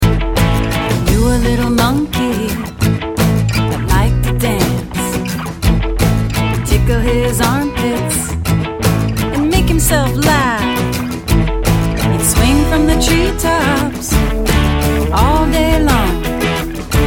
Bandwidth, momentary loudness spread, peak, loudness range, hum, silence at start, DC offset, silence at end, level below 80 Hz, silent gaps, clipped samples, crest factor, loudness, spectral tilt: 17.5 kHz; 5 LU; 0 dBFS; 2 LU; none; 0 s; under 0.1%; 0 s; -20 dBFS; none; under 0.1%; 12 dB; -14 LUFS; -5 dB/octave